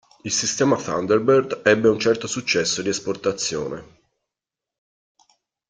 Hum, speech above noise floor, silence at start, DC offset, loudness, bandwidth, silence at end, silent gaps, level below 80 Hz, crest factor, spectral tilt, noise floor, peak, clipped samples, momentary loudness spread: none; 67 dB; 0.25 s; under 0.1%; -21 LUFS; 9.6 kHz; 1.85 s; none; -60 dBFS; 20 dB; -3.5 dB/octave; -87 dBFS; -2 dBFS; under 0.1%; 8 LU